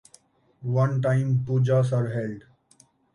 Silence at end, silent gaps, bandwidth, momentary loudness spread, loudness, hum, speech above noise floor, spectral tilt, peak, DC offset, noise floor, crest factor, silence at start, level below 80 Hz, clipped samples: 0.75 s; none; 10.5 kHz; 13 LU; -24 LUFS; none; 37 dB; -8.5 dB/octave; -10 dBFS; under 0.1%; -60 dBFS; 14 dB; 0.6 s; -62 dBFS; under 0.1%